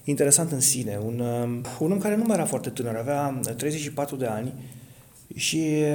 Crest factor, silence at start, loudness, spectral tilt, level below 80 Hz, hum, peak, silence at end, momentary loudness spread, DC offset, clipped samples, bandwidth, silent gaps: 24 dB; 0.05 s; -25 LUFS; -4 dB/octave; -62 dBFS; none; -2 dBFS; 0 s; 11 LU; under 0.1%; under 0.1%; 19 kHz; none